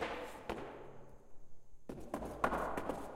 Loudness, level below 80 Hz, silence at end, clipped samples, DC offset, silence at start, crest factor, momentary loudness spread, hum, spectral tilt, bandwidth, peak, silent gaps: -42 LUFS; -58 dBFS; 0 s; under 0.1%; under 0.1%; 0 s; 24 dB; 20 LU; none; -5.5 dB/octave; 16.5 kHz; -18 dBFS; none